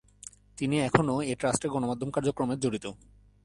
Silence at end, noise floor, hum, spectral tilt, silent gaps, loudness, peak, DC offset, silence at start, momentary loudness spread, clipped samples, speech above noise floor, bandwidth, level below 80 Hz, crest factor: 0.5 s; -51 dBFS; none; -5.5 dB/octave; none; -29 LUFS; -4 dBFS; under 0.1%; 0.25 s; 18 LU; under 0.1%; 23 dB; 11.5 kHz; -56 dBFS; 26 dB